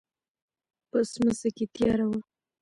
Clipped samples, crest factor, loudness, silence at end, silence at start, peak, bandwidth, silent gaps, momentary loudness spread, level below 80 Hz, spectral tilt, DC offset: under 0.1%; 16 dB; -28 LUFS; 0.4 s; 0.95 s; -14 dBFS; 11.5 kHz; none; 6 LU; -58 dBFS; -6 dB/octave; under 0.1%